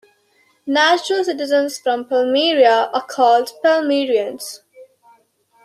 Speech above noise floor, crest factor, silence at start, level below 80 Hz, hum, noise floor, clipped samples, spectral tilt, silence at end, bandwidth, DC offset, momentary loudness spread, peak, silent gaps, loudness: 43 dB; 16 dB; 0.65 s; -74 dBFS; none; -59 dBFS; under 0.1%; -2 dB/octave; 0.8 s; 14.5 kHz; under 0.1%; 12 LU; -2 dBFS; none; -16 LUFS